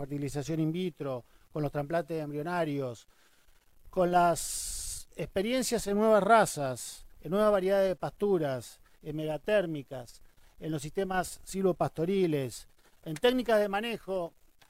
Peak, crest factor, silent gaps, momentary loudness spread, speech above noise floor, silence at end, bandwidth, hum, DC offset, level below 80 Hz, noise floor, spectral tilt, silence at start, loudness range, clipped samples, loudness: -10 dBFS; 20 dB; none; 16 LU; 32 dB; 0.4 s; 16 kHz; none; under 0.1%; -54 dBFS; -62 dBFS; -5 dB/octave; 0 s; 6 LU; under 0.1%; -30 LUFS